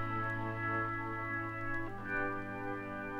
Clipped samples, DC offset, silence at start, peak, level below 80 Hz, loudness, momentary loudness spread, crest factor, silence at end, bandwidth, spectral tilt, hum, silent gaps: under 0.1%; under 0.1%; 0 s; -24 dBFS; -54 dBFS; -38 LUFS; 5 LU; 14 dB; 0 s; 11 kHz; -8 dB/octave; none; none